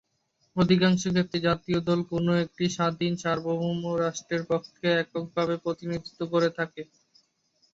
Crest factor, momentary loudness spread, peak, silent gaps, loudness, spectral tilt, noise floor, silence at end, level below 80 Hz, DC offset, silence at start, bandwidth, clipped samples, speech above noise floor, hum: 18 dB; 10 LU; -8 dBFS; none; -27 LUFS; -6 dB/octave; -72 dBFS; 0.9 s; -60 dBFS; under 0.1%; 0.55 s; 7.8 kHz; under 0.1%; 46 dB; none